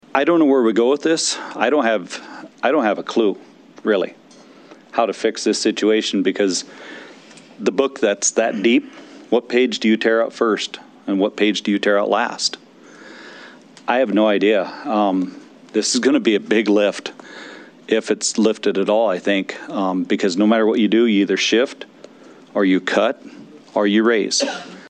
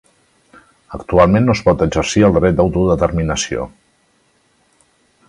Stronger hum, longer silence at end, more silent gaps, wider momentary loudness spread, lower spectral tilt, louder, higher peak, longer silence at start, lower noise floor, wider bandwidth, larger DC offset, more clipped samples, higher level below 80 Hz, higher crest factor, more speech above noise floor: neither; second, 0 s vs 1.6 s; neither; first, 16 LU vs 13 LU; second, -3.5 dB/octave vs -6 dB/octave; second, -18 LUFS vs -14 LUFS; about the same, 0 dBFS vs 0 dBFS; second, 0.15 s vs 0.9 s; second, -45 dBFS vs -58 dBFS; second, 9.8 kHz vs 11 kHz; neither; neither; second, -74 dBFS vs -32 dBFS; about the same, 18 dB vs 16 dB; second, 27 dB vs 45 dB